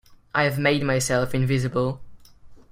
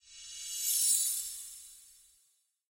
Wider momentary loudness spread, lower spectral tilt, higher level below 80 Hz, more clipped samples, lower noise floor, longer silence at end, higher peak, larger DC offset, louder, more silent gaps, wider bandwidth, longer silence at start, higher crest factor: second, 7 LU vs 21 LU; first, -5 dB/octave vs 6 dB/octave; first, -50 dBFS vs -76 dBFS; neither; second, -46 dBFS vs -73 dBFS; second, 0.15 s vs 0.8 s; first, -6 dBFS vs -14 dBFS; neither; first, -23 LUFS vs -29 LUFS; neither; about the same, 16 kHz vs 16.5 kHz; about the same, 0.1 s vs 0.05 s; about the same, 18 dB vs 22 dB